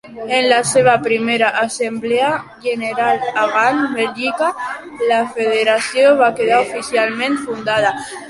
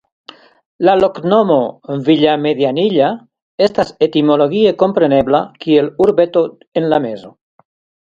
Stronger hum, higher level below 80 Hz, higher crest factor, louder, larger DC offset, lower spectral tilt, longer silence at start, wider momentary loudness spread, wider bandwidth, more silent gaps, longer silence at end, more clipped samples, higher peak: neither; second, -58 dBFS vs -52 dBFS; about the same, 14 dB vs 14 dB; about the same, -16 LUFS vs -14 LUFS; neither; second, -3 dB/octave vs -7.5 dB/octave; second, 0.05 s vs 0.8 s; about the same, 8 LU vs 7 LU; first, 11.5 kHz vs 7.6 kHz; second, none vs 3.42-3.58 s, 6.67-6.72 s; second, 0 s vs 0.8 s; neither; about the same, -2 dBFS vs 0 dBFS